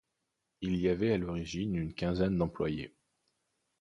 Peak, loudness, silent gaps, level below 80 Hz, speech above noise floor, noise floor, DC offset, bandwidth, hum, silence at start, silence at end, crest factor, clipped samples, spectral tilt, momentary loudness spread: -16 dBFS; -33 LUFS; none; -52 dBFS; 52 dB; -84 dBFS; under 0.1%; 10.5 kHz; none; 0.6 s; 0.9 s; 18 dB; under 0.1%; -7.5 dB/octave; 9 LU